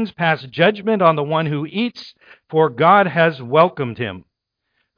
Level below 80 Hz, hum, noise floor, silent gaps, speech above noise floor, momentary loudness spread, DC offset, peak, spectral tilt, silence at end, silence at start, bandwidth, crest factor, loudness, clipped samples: -64 dBFS; none; -74 dBFS; none; 56 dB; 12 LU; under 0.1%; 0 dBFS; -8 dB/octave; 0.75 s; 0 s; 5.2 kHz; 18 dB; -17 LUFS; under 0.1%